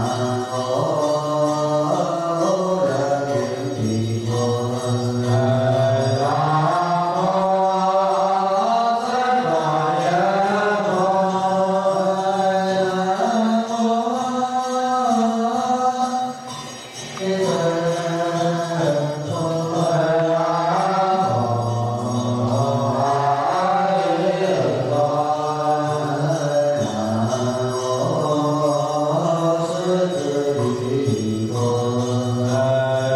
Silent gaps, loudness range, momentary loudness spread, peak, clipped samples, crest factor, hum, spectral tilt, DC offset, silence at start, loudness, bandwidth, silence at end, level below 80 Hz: none; 3 LU; 4 LU; -8 dBFS; under 0.1%; 12 dB; none; -6 dB/octave; under 0.1%; 0 s; -20 LUFS; 13 kHz; 0 s; -58 dBFS